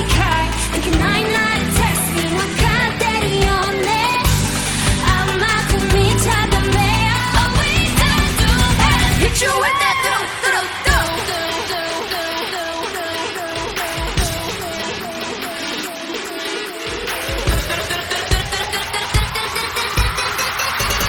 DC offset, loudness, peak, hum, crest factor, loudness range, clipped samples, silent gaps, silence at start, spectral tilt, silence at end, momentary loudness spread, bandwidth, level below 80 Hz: under 0.1%; -17 LUFS; 0 dBFS; none; 18 dB; 8 LU; under 0.1%; none; 0 s; -3.5 dB/octave; 0 s; 8 LU; 19.5 kHz; -26 dBFS